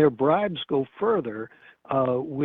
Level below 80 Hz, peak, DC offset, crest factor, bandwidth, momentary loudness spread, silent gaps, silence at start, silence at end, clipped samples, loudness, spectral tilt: -64 dBFS; -6 dBFS; under 0.1%; 18 dB; 4 kHz; 13 LU; none; 0 s; 0 s; under 0.1%; -25 LUFS; -9.5 dB/octave